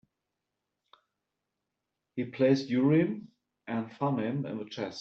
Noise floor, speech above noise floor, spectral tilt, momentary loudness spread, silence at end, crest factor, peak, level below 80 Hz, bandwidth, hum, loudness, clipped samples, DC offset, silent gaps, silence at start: -86 dBFS; 57 dB; -6.5 dB/octave; 14 LU; 0 s; 20 dB; -12 dBFS; -76 dBFS; 7 kHz; none; -30 LUFS; under 0.1%; under 0.1%; none; 2.15 s